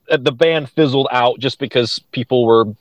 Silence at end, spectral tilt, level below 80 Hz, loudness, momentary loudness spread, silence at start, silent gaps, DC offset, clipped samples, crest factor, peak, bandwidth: 0.05 s; -6 dB/octave; -58 dBFS; -16 LUFS; 7 LU; 0.1 s; none; under 0.1%; under 0.1%; 16 dB; 0 dBFS; 9.8 kHz